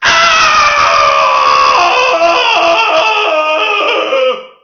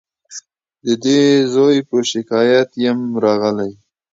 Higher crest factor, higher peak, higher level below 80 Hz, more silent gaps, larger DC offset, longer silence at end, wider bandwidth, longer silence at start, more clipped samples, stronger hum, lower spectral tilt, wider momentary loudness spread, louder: about the same, 10 dB vs 14 dB; about the same, 0 dBFS vs -2 dBFS; first, -44 dBFS vs -64 dBFS; neither; neither; second, 0.15 s vs 0.4 s; about the same, 7.4 kHz vs 7.8 kHz; second, 0 s vs 0.3 s; neither; neither; second, -1 dB/octave vs -5 dB/octave; second, 5 LU vs 18 LU; first, -8 LUFS vs -15 LUFS